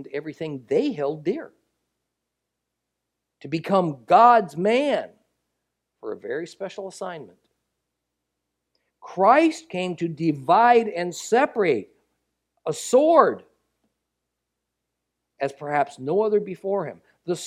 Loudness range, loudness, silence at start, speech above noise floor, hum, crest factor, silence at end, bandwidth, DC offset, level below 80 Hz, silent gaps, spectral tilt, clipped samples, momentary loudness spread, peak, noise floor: 11 LU; -21 LUFS; 0 s; 60 dB; none; 22 dB; 0 s; 14 kHz; under 0.1%; -74 dBFS; none; -5.5 dB/octave; under 0.1%; 18 LU; -2 dBFS; -82 dBFS